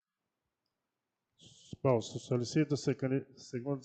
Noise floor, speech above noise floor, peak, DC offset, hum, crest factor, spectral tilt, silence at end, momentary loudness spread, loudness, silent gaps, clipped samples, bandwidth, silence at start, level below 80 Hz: -89 dBFS; 56 dB; -16 dBFS; under 0.1%; none; 20 dB; -6.5 dB/octave; 0 s; 10 LU; -34 LUFS; none; under 0.1%; 9 kHz; 1.45 s; -74 dBFS